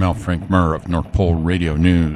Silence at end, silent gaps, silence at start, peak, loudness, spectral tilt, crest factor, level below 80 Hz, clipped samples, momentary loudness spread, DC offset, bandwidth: 0 s; none; 0 s; -2 dBFS; -18 LUFS; -8 dB/octave; 16 dB; -28 dBFS; under 0.1%; 6 LU; under 0.1%; 10.5 kHz